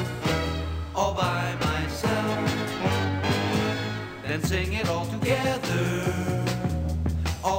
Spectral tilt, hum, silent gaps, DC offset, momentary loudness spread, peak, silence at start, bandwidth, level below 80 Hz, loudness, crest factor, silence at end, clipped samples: -5.5 dB/octave; none; none; under 0.1%; 4 LU; -10 dBFS; 0 s; 16 kHz; -38 dBFS; -27 LUFS; 16 dB; 0 s; under 0.1%